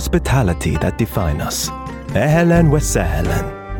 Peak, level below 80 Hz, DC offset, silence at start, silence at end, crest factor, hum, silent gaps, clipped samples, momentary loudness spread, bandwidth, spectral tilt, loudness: -2 dBFS; -26 dBFS; under 0.1%; 0 s; 0 s; 14 dB; none; none; under 0.1%; 9 LU; 18.5 kHz; -5.5 dB/octave; -17 LUFS